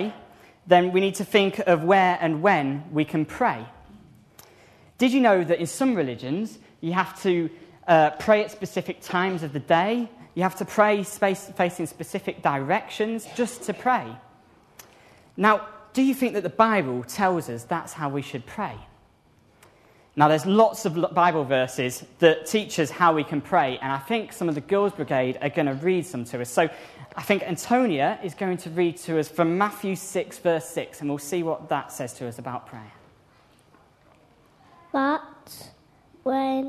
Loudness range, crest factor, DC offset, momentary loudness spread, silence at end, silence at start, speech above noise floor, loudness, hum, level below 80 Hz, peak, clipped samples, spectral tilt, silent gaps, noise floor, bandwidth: 8 LU; 22 dB; under 0.1%; 13 LU; 0 s; 0 s; 35 dB; -24 LUFS; none; -64 dBFS; -2 dBFS; under 0.1%; -5.5 dB/octave; none; -59 dBFS; 13.5 kHz